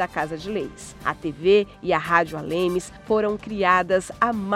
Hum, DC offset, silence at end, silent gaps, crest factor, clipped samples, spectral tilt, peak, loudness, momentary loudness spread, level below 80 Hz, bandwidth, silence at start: none; under 0.1%; 0 s; none; 20 dB; under 0.1%; -5 dB/octave; -4 dBFS; -23 LUFS; 10 LU; -50 dBFS; 14 kHz; 0 s